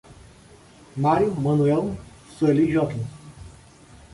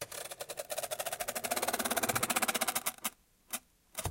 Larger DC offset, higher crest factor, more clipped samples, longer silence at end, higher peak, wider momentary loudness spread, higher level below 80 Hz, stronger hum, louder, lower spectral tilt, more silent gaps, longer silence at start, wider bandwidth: neither; second, 16 dB vs 22 dB; neither; first, 0.6 s vs 0 s; first, -8 dBFS vs -14 dBFS; first, 18 LU vs 12 LU; first, -50 dBFS vs -64 dBFS; neither; first, -22 LUFS vs -34 LUFS; first, -8.5 dB/octave vs -1.5 dB/octave; neither; about the same, 0.1 s vs 0 s; second, 11.5 kHz vs 17 kHz